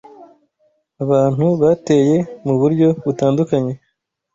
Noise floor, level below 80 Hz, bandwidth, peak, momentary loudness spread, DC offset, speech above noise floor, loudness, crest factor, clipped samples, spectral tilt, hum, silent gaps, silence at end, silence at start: -71 dBFS; -54 dBFS; 7.8 kHz; -2 dBFS; 6 LU; under 0.1%; 56 dB; -16 LUFS; 14 dB; under 0.1%; -8.5 dB/octave; none; none; 0.6 s; 0.2 s